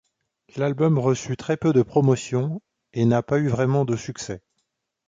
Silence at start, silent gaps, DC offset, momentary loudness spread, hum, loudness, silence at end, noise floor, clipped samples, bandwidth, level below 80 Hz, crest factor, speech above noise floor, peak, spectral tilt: 0.55 s; none; under 0.1%; 14 LU; none; -22 LUFS; 0.7 s; -76 dBFS; under 0.1%; 7.8 kHz; -56 dBFS; 16 dB; 55 dB; -6 dBFS; -7 dB/octave